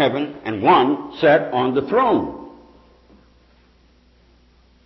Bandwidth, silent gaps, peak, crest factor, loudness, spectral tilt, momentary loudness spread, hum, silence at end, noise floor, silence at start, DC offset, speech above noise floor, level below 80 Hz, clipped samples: 6 kHz; none; -4 dBFS; 16 dB; -18 LUFS; -8 dB/octave; 11 LU; none; 2.35 s; -54 dBFS; 0 s; under 0.1%; 37 dB; -54 dBFS; under 0.1%